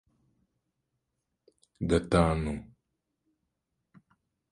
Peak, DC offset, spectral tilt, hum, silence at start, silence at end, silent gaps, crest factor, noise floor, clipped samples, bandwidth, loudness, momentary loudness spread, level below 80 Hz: -10 dBFS; under 0.1%; -7 dB/octave; none; 1.8 s; 1.85 s; none; 24 dB; -83 dBFS; under 0.1%; 11.5 kHz; -29 LUFS; 12 LU; -46 dBFS